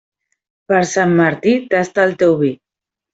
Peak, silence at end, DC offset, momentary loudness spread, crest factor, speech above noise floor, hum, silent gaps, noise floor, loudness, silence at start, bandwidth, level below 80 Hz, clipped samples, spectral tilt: -2 dBFS; 0.6 s; under 0.1%; 4 LU; 14 dB; 72 dB; none; none; -86 dBFS; -15 LUFS; 0.7 s; 8 kHz; -58 dBFS; under 0.1%; -6 dB/octave